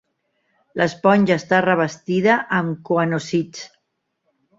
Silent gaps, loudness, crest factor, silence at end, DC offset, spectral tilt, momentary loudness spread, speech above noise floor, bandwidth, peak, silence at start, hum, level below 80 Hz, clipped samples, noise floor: none; -19 LUFS; 18 dB; 0.9 s; under 0.1%; -6 dB/octave; 14 LU; 55 dB; 7.8 kHz; -2 dBFS; 0.75 s; none; -62 dBFS; under 0.1%; -74 dBFS